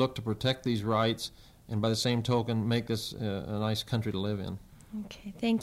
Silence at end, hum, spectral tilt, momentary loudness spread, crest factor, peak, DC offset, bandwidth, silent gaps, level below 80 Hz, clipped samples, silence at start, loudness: 0 s; none; -5.5 dB/octave; 13 LU; 16 dB; -14 dBFS; under 0.1%; 15.5 kHz; none; -58 dBFS; under 0.1%; 0 s; -31 LUFS